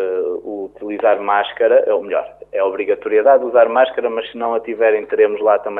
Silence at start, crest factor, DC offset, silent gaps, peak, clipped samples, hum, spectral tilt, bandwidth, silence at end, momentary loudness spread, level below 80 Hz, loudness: 0 s; 14 dB; under 0.1%; none; -2 dBFS; under 0.1%; none; -7 dB/octave; 3.9 kHz; 0 s; 10 LU; -60 dBFS; -16 LUFS